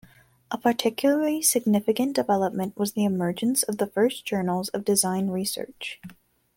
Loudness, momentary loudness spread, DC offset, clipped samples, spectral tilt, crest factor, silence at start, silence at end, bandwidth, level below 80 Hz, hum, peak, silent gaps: -24 LUFS; 9 LU; under 0.1%; under 0.1%; -4 dB/octave; 18 dB; 0.5 s; 0.45 s; 17 kHz; -66 dBFS; none; -8 dBFS; none